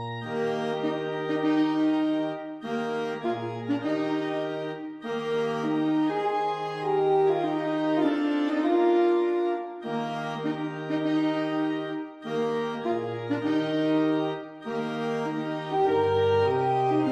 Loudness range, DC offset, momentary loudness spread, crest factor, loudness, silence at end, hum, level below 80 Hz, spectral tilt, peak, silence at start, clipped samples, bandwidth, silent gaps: 4 LU; under 0.1%; 9 LU; 14 dB; -27 LUFS; 0 s; none; -74 dBFS; -7 dB/octave; -12 dBFS; 0 s; under 0.1%; 8.4 kHz; none